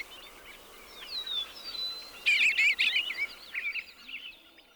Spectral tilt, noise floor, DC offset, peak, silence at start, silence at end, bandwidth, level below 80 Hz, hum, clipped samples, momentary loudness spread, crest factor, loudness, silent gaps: 1.5 dB/octave; -51 dBFS; under 0.1%; -16 dBFS; 0 s; 0.4 s; over 20 kHz; -66 dBFS; none; under 0.1%; 24 LU; 18 dB; -28 LUFS; none